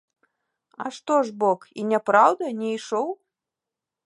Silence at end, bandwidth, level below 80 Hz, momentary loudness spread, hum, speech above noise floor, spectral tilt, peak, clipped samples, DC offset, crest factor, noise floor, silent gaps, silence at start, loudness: 0.9 s; 11.5 kHz; -82 dBFS; 16 LU; none; 65 dB; -5 dB/octave; -4 dBFS; under 0.1%; under 0.1%; 22 dB; -87 dBFS; none; 0.8 s; -23 LUFS